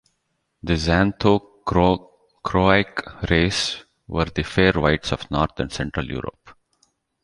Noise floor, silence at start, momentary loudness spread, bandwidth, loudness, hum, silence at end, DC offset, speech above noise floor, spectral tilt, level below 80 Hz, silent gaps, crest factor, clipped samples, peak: -73 dBFS; 0.65 s; 12 LU; 11.5 kHz; -21 LUFS; none; 0.7 s; under 0.1%; 53 dB; -5.5 dB/octave; -36 dBFS; none; 20 dB; under 0.1%; -2 dBFS